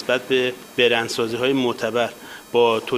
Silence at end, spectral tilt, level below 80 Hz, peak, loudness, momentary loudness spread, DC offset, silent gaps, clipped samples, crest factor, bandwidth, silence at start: 0 s; -4 dB/octave; -62 dBFS; -4 dBFS; -21 LUFS; 6 LU; under 0.1%; none; under 0.1%; 18 dB; 15.5 kHz; 0 s